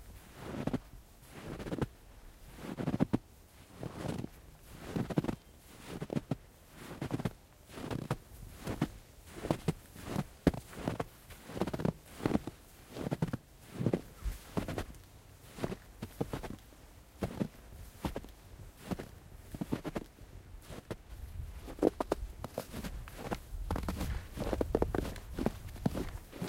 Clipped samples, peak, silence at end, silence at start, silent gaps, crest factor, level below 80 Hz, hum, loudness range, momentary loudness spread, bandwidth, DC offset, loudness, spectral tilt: under 0.1%; -10 dBFS; 0 s; 0 s; none; 30 dB; -48 dBFS; none; 6 LU; 19 LU; 16.5 kHz; under 0.1%; -39 LUFS; -6.5 dB/octave